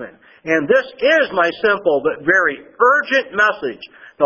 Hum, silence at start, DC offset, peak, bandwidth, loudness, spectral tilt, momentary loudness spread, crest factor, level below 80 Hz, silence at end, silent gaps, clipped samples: none; 0 s; under 0.1%; 0 dBFS; 7 kHz; -16 LUFS; -4.5 dB/octave; 12 LU; 16 dB; -60 dBFS; 0 s; none; under 0.1%